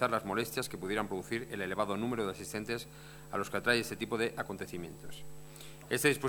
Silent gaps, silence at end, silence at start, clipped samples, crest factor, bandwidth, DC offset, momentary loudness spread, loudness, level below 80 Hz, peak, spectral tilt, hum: none; 0 s; 0 s; under 0.1%; 24 dB; over 20 kHz; under 0.1%; 19 LU; -35 LUFS; -62 dBFS; -12 dBFS; -4 dB/octave; none